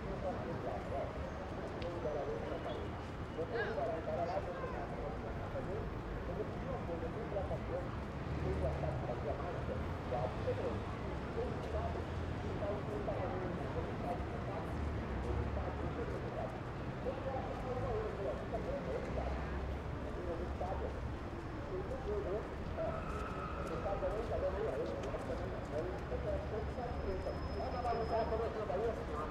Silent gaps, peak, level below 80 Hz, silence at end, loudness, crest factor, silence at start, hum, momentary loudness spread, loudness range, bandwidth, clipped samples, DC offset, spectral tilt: none; -24 dBFS; -48 dBFS; 0 s; -41 LUFS; 14 dB; 0 s; none; 5 LU; 2 LU; 11 kHz; under 0.1%; under 0.1%; -7.5 dB/octave